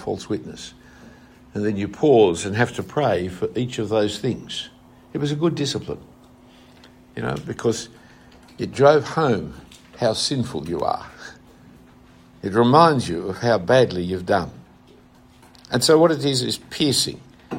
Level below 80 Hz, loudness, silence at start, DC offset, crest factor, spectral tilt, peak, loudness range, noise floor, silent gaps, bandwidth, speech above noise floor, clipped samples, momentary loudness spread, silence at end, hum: -54 dBFS; -21 LUFS; 0 s; under 0.1%; 22 dB; -5 dB/octave; 0 dBFS; 7 LU; -50 dBFS; none; 16 kHz; 30 dB; under 0.1%; 18 LU; 0 s; none